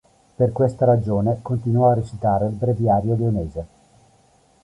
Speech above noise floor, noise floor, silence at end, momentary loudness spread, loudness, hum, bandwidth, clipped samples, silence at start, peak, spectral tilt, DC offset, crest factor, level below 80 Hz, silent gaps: 38 dB; -57 dBFS; 0.95 s; 7 LU; -20 LUFS; none; 9.4 kHz; under 0.1%; 0.4 s; -4 dBFS; -10.5 dB/octave; under 0.1%; 16 dB; -44 dBFS; none